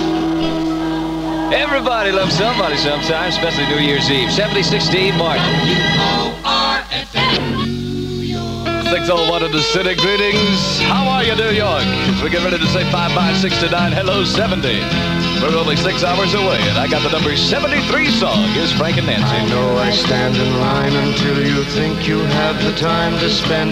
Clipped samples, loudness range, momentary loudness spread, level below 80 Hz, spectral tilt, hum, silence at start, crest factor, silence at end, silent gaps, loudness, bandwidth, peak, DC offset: under 0.1%; 2 LU; 4 LU; -36 dBFS; -5 dB/octave; none; 0 s; 12 dB; 0 s; none; -15 LUFS; 16 kHz; -4 dBFS; under 0.1%